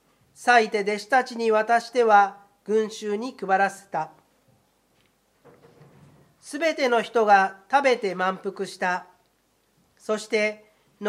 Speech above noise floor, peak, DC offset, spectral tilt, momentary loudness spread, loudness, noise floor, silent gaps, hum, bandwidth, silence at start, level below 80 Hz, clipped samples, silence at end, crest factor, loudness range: 44 dB; -4 dBFS; under 0.1%; -3.5 dB/octave; 13 LU; -23 LUFS; -67 dBFS; none; none; 13.5 kHz; 0.4 s; -78 dBFS; under 0.1%; 0 s; 20 dB; 8 LU